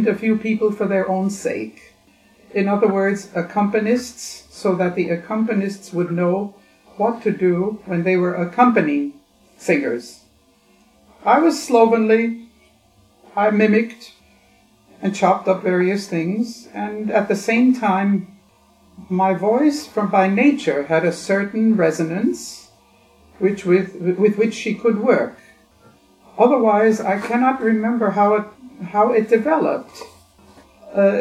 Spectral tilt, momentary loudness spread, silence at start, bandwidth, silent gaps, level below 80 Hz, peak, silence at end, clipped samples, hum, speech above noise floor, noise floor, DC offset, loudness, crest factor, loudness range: -6.5 dB/octave; 11 LU; 0 s; 13.5 kHz; none; -62 dBFS; 0 dBFS; 0 s; under 0.1%; none; 38 dB; -56 dBFS; under 0.1%; -19 LUFS; 20 dB; 3 LU